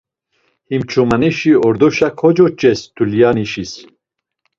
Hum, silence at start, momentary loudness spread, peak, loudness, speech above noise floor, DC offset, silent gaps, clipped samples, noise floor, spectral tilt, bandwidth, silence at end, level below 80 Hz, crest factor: none; 0.7 s; 11 LU; 0 dBFS; -14 LUFS; 62 dB; under 0.1%; none; under 0.1%; -75 dBFS; -6.5 dB/octave; 7.6 kHz; 0.75 s; -48 dBFS; 14 dB